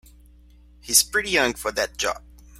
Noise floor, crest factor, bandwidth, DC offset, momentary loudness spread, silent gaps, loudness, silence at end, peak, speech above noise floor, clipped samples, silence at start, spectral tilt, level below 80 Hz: -51 dBFS; 24 dB; 16.5 kHz; under 0.1%; 10 LU; none; -21 LUFS; 0.4 s; 0 dBFS; 28 dB; under 0.1%; 0.85 s; -0.5 dB/octave; -48 dBFS